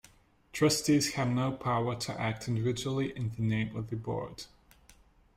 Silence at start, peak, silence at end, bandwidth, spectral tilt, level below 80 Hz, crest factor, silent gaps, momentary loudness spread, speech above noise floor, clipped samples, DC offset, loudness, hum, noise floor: 0.55 s; -16 dBFS; 0.9 s; 16 kHz; -5 dB/octave; -58 dBFS; 18 dB; none; 10 LU; 30 dB; under 0.1%; under 0.1%; -31 LUFS; none; -61 dBFS